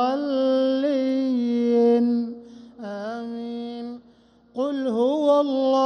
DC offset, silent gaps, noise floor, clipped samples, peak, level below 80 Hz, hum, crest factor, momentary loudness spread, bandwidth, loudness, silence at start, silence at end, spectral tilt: under 0.1%; none; -55 dBFS; under 0.1%; -8 dBFS; -70 dBFS; none; 14 dB; 16 LU; 9 kHz; -23 LUFS; 0 s; 0 s; -6.5 dB/octave